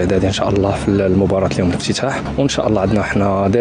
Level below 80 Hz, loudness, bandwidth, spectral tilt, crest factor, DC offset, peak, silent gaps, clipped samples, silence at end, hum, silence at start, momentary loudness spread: -34 dBFS; -16 LUFS; 10 kHz; -6 dB/octave; 14 dB; under 0.1%; -2 dBFS; none; under 0.1%; 0 s; none; 0 s; 3 LU